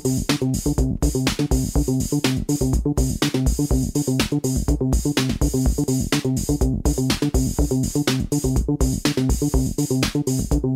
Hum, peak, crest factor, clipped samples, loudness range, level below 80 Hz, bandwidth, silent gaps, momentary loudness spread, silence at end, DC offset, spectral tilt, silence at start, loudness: none; -6 dBFS; 14 dB; under 0.1%; 0 LU; -26 dBFS; 16 kHz; none; 1 LU; 0 s; under 0.1%; -5.5 dB/octave; 0 s; -21 LUFS